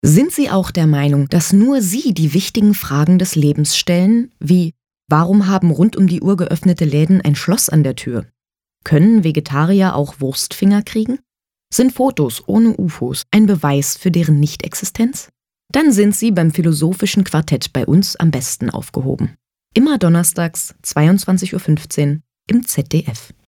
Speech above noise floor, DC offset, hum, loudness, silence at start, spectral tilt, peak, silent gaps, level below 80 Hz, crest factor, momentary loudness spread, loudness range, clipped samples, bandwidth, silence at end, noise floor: 30 dB; under 0.1%; none; -15 LUFS; 0.05 s; -5.5 dB/octave; 0 dBFS; none; -46 dBFS; 14 dB; 8 LU; 2 LU; under 0.1%; 19 kHz; 0.25 s; -44 dBFS